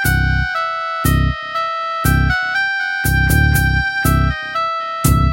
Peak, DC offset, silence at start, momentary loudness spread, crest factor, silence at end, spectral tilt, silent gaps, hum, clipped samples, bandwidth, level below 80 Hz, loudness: 0 dBFS; under 0.1%; 0 s; 6 LU; 16 dB; 0 s; -5 dB/octave; none; none; under 0.1%; 16.5 kHz; -22 dBFS; -16 LUFS